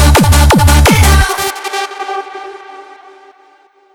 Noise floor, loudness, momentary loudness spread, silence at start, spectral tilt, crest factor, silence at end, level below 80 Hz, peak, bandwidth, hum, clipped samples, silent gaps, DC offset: -47 dBFS; -10 LUFS; 20 LU; 0 s; -4.5 dB/octave; 10 dB; 1.15 s; -14 dBFS; 0 dBFS; 18 kHz; none; under 0.1%; none; under 0.1%